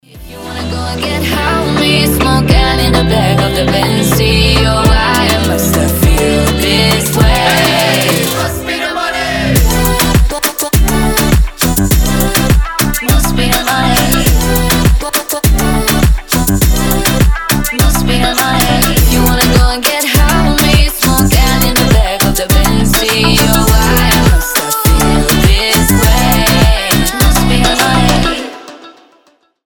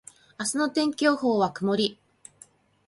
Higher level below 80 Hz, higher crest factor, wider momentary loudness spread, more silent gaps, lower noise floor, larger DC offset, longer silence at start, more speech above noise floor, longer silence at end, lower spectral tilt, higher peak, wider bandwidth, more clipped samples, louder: first, -14 dBFS vs -72 dBFS; second, 10 dB vs 18 dB; about the same, 4 LU vs 6 LU; neither; second, -52 dBFS vs -56 dBFS; neither; second, 0.15 s vs 0.4 s; first, 42 dB vs 32 dB; second, 0.75 s vs 0.95 s; about the same, -4 dB/octave vs -4 dB/octave; first, 0 dBFS vs -8 dBFS; first, over 20 kHz vs 11.5 kHz; neither; first, -10 LUFS vs -25 LUFS